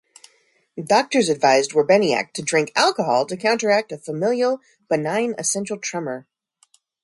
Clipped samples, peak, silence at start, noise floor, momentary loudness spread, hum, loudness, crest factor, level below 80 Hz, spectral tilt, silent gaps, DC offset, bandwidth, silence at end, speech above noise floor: under 0.1%; -2 dBFS; 0.75 s; -61 dBFS; 12 LU; none; -20 LUFS; 18 dB; -70 dBFS; -3.5 dB/octave; none; under 0.1%; 11.5 kHz; 0.85 s; 41 dB